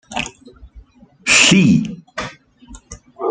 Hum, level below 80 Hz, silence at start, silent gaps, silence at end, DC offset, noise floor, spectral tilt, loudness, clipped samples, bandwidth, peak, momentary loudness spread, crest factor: none; -46 dBFS; 0.1 s; none; 0 s; under 0.1%; -44 dBFS; -3.5 dB/octave; -13 LUFS; under 0.1%; 9.6 kHz; 0 dBFS; 19 LU; 18 dB